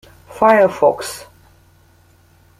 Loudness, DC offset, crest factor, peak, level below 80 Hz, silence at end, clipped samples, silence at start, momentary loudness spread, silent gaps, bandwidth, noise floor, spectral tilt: -14 LUFS; under 0.1%; 16 dB; -2 dBFS; -54 dBFS; 1.35 s; under 0.1%; 0.3 s; 17 LU; none; 15.5 kHz; -51 dBFS; -4.5 dB/octave